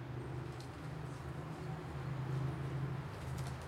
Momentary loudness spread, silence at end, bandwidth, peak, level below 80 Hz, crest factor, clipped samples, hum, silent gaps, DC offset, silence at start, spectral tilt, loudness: 6 LU; 0 s; 14 kHz; -28 dBFS; -56 dBFS; 14 dB; under 0.1%; none; none; under 0.1%; 0 s; -7 dB/octave; -43 LUFS